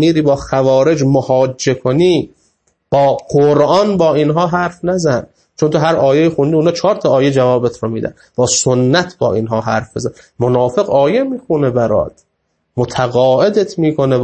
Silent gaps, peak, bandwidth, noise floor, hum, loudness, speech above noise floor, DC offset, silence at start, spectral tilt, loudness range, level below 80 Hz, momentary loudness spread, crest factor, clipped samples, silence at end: none; 0 dBFS; 8.8 kHz; -66 dBFS; none; -13 LUFS; 54 dB; under 0.1%; 0 s; -5.5 dB/octave; 2 LU; -46 dBFS; 7 LU; 14 dB; under 0.1%; 0 s